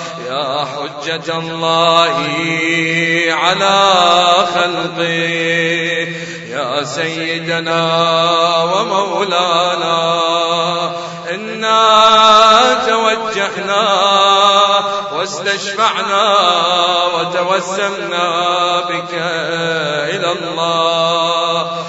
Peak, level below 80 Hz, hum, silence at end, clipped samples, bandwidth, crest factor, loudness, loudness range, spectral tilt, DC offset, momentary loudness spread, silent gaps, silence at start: 0 dBFS; -56 dBFS; none; 0 s; under 0.1%; 11 kHz; 14 dB; -13 LUFS; 5 LU; -3 dB/octave; under 0.1%; 10 LU; none; 0 s